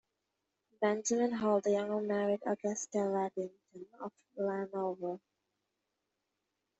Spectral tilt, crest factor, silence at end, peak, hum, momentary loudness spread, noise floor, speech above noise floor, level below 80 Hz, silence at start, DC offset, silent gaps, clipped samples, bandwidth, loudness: -5 dB/octave; 18 dB; 1.6 s; -18 dBFS; none; 15 LU; -86 dBFS; 51 dB; -80 dBFS; 0.8 s; under 0.1%; none; under 0.1%; 8.2 kHz; -35 LUFS